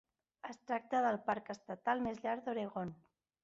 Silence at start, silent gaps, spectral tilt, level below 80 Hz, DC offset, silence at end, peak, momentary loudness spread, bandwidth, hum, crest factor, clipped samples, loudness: 0.45 s; none; -4.5 dB/octave; -74 dBFS; under 0.1%; 0.5 s; -22 dBFS; 13 LU; 7.6 kHz; none; 18 dB; under 0.1%; -39 LUFS